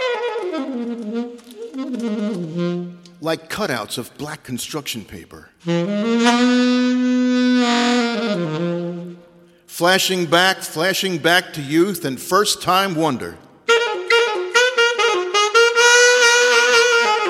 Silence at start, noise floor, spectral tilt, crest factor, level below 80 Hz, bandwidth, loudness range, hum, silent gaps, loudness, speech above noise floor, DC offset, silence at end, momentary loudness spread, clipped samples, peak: 0 s; -48 dBFS; -3 dB/octave; 18 dB; -62 dBFS; 16 kHz; 11 LU; none; none; -17 LUFS; 29 dB; under 0.1%; 0 s; 16 LU; under 0.1%; 0 dBFS